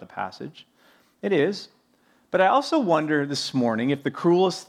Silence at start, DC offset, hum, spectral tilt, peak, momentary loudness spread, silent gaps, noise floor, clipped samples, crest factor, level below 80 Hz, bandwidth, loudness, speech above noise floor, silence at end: 0 s; under 0.1%; none; -5.5 dB/octave; -6 dBFS; 14 LU; none; -63 dBFS; under 0.1%; 18 dB; -76 dBFS; 13 kHz; -23 LUFS; 40 dB; 0.05 s